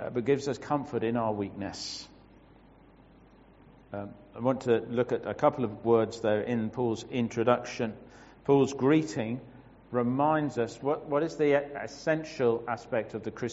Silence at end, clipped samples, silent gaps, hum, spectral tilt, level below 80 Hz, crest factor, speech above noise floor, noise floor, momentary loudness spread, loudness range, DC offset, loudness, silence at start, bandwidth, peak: 0 s; under 0.1%; none; none; -5.5 dB/octave; -62 dBFS; 22 dB; 27 dB; -56 dBFS; 12 LU; 7 LU; under 0.1%; -29 LUFS; 0 s; 8 kHz; -8 dBFS